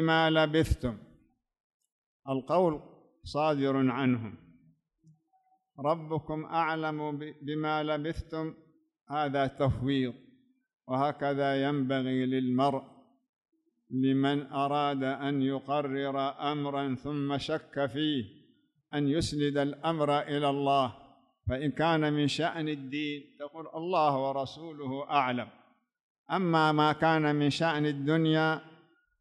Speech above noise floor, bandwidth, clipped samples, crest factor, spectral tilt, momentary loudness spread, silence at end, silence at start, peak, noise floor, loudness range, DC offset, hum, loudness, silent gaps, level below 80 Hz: 42 dB; 12 kHz; under 0.1%; 18 dB; -6.5 dB/octave; 11 LU; 0.45 s; 0 s; -12 dBFS; -71 dBFS; 5 LU; under 0.1%; none; -30 LUFS; 1.60-1.80 s, 1.92-2.20 s, 10.73-10.79 s, 13.29-13.33 s, 26.01-26.26 s; -54 dBFS